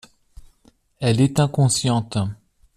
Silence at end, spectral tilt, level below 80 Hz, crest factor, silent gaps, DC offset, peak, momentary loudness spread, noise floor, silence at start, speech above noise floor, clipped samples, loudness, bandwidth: 0.45 s; -5.5 dB/octave; -50 dBFS; 18 dB; none; under 0.1%; -4 dBFS; 8 LU; -58 dBFS; 1 s; 39 dB; under 0.1%; -20 LUFS; 14.5 kHz